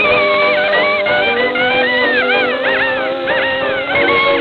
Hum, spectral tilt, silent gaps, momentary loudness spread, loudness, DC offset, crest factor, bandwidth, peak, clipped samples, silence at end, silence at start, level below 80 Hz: none; -5.5 dB/octave; none; 4 LU; -13 LUFS; under 0.1%; 12 dB; 5.8 kHz; 0 dBFS; under 0.1%; 0 s; 0 s; -48 dBFS